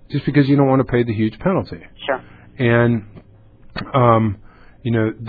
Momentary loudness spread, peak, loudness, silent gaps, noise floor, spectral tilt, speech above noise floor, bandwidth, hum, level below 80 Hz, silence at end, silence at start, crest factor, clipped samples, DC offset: 15 LU; 0 dBFS; -18 LUFS; none; -44 dBFS; -11 dB/octave; 27 dB; 4.9 kHz; none; -44 dBFS; 0 s; 0.1 s; 18 dB; under 0.1%; under 0.1%